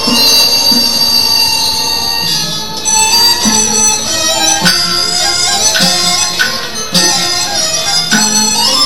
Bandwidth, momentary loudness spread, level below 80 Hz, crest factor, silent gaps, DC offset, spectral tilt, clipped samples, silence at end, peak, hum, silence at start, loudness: over 20 kHz; 5 LU; -40 dBFS; 12 dB; none; 5%; -0.5 dB/octave; 0.1%; 0 s; 0 dBFS; none; 0 s; -8 LUFS